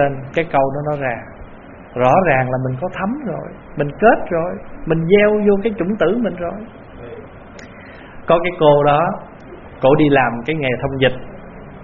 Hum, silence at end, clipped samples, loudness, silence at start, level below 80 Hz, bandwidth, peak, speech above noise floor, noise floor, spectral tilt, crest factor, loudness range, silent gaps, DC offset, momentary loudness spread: none; 0 s; under 0.1%; -16 LUFS; 0 s; -40 dBFS; 4.5 kHz; 0 dBFS; 21 dB; -37 dBFS; -5 dB/octave; 18 dB; 3 LU; none; under 0.1%; 24 LU